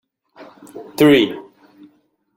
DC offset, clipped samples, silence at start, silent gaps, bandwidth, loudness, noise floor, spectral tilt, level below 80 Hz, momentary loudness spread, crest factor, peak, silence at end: under 0.1%; under 0.1%; 0.75 s; none; 16.5 kHz; -14 LUFS; -58 dBFS; -5.5 dB/octave; -58 dBFS; 25 LU; 18 dB; -2 dBFS; 0.95 s